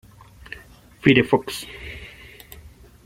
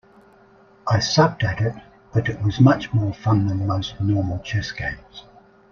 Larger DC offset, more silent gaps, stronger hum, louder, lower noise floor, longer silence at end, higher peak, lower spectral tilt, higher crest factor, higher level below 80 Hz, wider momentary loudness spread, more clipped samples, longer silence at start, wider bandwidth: neither; neither; neither; about the same, -20 LUFS vs -21 LUFS; second, -47 dBFS vs -52 dBFS; first, 1 s vs 0.5 s; about the same, -2 dBFS vs -2 dBFS; about the same, -5.5 dB/octave vs -6 dB/octave; about the same, 22 dB vs 20 dB; about the same, -48 dBFS vs -46 dBFS; first, 26 LU vs 12 LU; neither; first, 1.05 s vs 0.85 s; first, 16.5 kHz vs 7.2 kHz